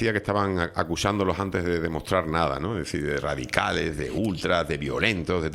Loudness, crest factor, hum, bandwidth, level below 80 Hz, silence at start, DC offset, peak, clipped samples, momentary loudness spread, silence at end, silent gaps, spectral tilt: -26 LUFS; 22 dB; none; 16 kHz; -46 dBFS; 0 s; under 0.1%; -4 dBFS; under 0.1%; 4 LU; 0 s; none; -5.5 dB/octave